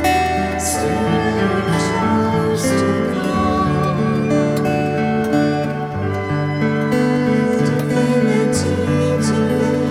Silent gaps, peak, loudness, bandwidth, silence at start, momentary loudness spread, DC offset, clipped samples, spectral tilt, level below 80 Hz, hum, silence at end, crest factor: none; -4 dBFS; -17 LUFS; 15.5 kHz; 0 s; 3 LU; under 0.1%; under 0.1%; -6 dB/octave; -40 dBFS; none; 0 s; 12 dB